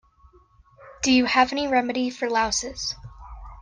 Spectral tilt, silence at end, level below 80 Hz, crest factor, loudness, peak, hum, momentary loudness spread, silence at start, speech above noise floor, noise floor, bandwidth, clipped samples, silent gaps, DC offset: -2.5 dB/octave; 0 s; -48 dBFS; 18 dB; -23 LUFS; -6 dBFS; none; 21 LU; 0.8 s; 34 dB; -56 dBFS; 10 kHz; under 0.1%; none; under 0.1%